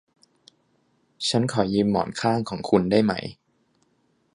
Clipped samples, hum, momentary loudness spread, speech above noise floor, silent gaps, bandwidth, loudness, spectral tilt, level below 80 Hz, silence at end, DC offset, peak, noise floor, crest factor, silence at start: under 0.1%; none; 7 LU; 45 dB; none; 11 kHz; -23 LUFS; -5.5 dB/octave; -56 dBFS; 1 s; under 0.1%; -4 dBFS; -67 dBFS; 20 dB; 1.2 s